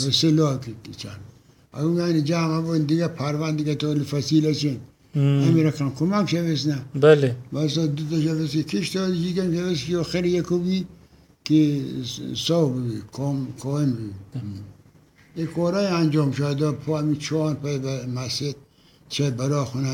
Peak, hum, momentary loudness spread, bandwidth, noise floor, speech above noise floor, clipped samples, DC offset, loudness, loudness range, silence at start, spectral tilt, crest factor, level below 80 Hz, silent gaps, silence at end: -4 dBFS; none; 12 LU; 16 kHz; -54 dBFS; 31 dB; under 0.1%; under 0.1%; -23 LUFS; 5 LU; 0 s; -6.5 dB/octave; 20 dB; -56 dBFS; none; 0 s